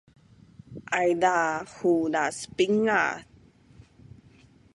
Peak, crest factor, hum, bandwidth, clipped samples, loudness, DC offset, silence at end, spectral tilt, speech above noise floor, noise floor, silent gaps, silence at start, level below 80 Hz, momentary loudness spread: -8 dBFS; 20 dB; none; 11.5 kHz; under 0.1%; -25 LUFS; under 0.1%; 1.5 s; -4.5 dB/octave; 31 dB; -56 dBFS; none; 0.7 s; -64 dBFS; 10 LU